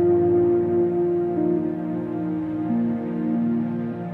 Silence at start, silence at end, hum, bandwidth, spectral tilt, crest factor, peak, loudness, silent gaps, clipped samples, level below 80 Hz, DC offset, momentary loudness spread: 0 s; 0 s; none; 3.2 kHz; -11.5 dB/octave; 10 dB; -12 dBFS; -23 LUFS; none; under 0.1%; -60 dBFS; under 0.1%; 8 LU